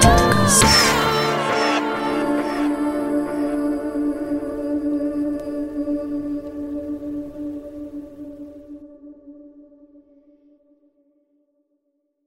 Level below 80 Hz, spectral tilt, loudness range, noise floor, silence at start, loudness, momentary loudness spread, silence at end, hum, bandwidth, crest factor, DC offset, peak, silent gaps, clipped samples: -36 dBFS; -3.5 dB/octave; 20 LU; -71 dBFS; 0 s; -20 LUFS; 21 LU; 2.65 s; none; 16 kHz; 22 dB; under 0.1%; 0 dBFS; none; under 0.1%